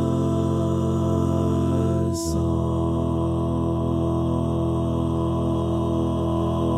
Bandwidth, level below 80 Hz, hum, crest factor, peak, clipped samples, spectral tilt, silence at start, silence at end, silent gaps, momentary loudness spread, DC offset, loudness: 13.5 kHz; -36 dBFS; none; 12 dB; -10 dBFS; under 0.1%; -8 dB/octave; 0 s; 0 s; none; 2 LU; under 0.1%; -23 LUFS